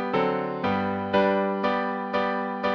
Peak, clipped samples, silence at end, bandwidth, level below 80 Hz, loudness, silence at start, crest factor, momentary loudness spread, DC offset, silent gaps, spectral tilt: -10 dBFS; under 0.1%; 0 s; 6.6 kHz; -60 dBFS; -25 LUFS; 0 s; 14 dB; 5 LU; under 0.1%; none; -7.5 dB/octave